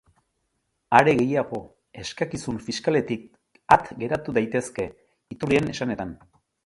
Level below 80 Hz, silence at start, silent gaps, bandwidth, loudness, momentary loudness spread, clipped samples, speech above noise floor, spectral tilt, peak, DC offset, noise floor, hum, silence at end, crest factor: -54 dBFS; 0.9 s; none; 11.5 kHz; -24 LUFS; 15 LU; under 0.1%; 51 dB; -5.5 dB/octave; 0 dBFS; under 0.1%; -75 dBFS; none; 0.5 s; 24 dB